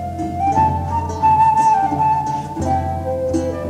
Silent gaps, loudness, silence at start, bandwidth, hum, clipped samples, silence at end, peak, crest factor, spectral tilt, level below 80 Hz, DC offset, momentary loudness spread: none; -17 LUFS; 0 s; 12 kHz; none; under 0.1%; 0 s; -4 dBFS; 14 dB; -7 dB/octave; -38 dBFS; under 0.1%; 9 LU